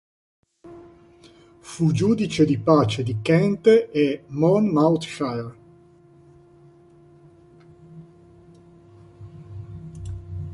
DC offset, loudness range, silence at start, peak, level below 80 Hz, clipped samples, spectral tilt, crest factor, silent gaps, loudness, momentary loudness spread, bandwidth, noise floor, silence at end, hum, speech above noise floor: under 0.1%; 18 LU; 0.65 s; -4 dBFS; -50 dBFS; under 0.1%; -7 dB/octave; 20 dB; none; -20 LUFS; 22 LU; 11.5 kHz; -52 dBFS; 0 s; none; 32 dB